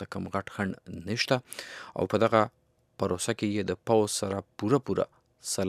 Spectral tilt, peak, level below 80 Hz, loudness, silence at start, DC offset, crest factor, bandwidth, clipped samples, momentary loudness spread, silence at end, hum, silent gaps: -4.5 dB/octave; -6 dBFS; -64 dBFS; -29 LUFS; 0 s; under 0.1%; 24 dB; 15.5 kHz; under 0.1%; 11 LU; 0 s; none; none